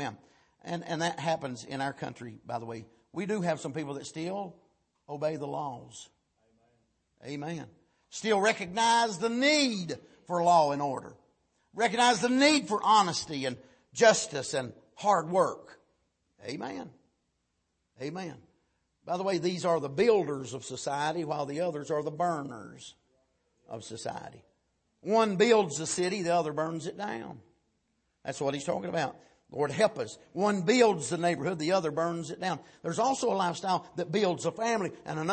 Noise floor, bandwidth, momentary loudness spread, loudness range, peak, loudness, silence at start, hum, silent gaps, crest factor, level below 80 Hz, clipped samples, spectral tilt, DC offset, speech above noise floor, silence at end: -78 dBFS; 8.8 kHz; 19 LU; 11 LU; -8 dBFS; -29 LUFS; 0 s; none; none; 22 dB; -72 dBFS; under 0.1%; -4 dB/octave; under 0.1%; 49 dB; 0 s